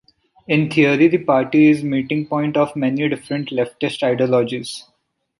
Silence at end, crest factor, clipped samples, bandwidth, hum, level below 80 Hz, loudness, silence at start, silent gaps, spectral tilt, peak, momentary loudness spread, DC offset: 0.6 s; 16 dB; under 0.1%; 11.5 kHz; none; -60 dBFS; -18 LUFS; 0.5 s; none; -6.5 dB/octave; -2 dBFS; 10 LU; under 0.1%